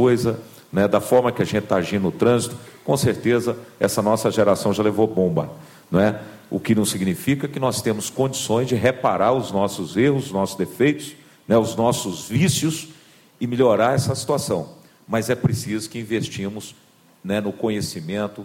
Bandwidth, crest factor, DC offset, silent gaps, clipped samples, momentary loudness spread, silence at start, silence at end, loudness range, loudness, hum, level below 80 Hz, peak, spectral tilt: 17 kHz; 16 dB; under 0.1%; none; under 0.1%; 10 LU; 0 s; 0 s; 4 LU; -21 LUFS; none; -54 dBFS; -4 dBFS; -5.5 dB/octave